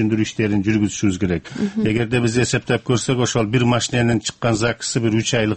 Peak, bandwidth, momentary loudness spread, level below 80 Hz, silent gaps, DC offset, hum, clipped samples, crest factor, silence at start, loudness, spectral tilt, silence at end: -4 dBFS; 8.8 kHz; 3 LU; -44 dBFS; none; under 0.1%; none; under 0.1%; 14 dB; 0 s; -19 LUFS; -5 dB/octave; 0 s